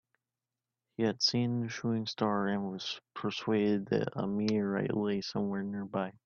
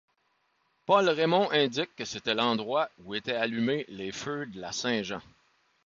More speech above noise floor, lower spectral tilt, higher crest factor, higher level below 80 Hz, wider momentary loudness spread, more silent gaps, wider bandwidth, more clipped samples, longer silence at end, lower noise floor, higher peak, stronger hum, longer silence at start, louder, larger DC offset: first, over 58 dB vs 44 dB; first, -5.5 dB/octave vs -4 dB/octave; about the same, 18 dB vs 20 dB; about the same, -72 dBFS vs -70 dBFS; second, 8 LU vs 12 LU; neither; about the same, 7.2 kHz vs 7.6 kHz; neither; second, 0.15 s vs 0.65 s; first, under -90 dBFS vs -73 dBFS; second, -16 dBFS vs -10 dBFS; neither; about the same, 1 s vs 0.9 s; second, -33 LUFS vs -29 LUFS; neither